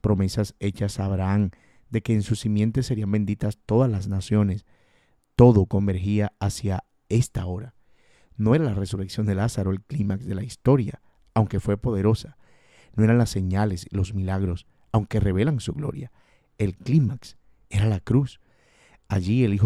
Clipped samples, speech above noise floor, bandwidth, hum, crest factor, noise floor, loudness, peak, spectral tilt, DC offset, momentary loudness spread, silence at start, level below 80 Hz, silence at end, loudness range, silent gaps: under 0.1%; 41 dB; 12.5 kHz; none; 22 dB; -63 dBFS; -24 LUFS; -2 dBFS; -7.5 dB/octave; under 0.1%; 10 LU; 0.05 s; -44 dBFS; 0 s; 4 LU; none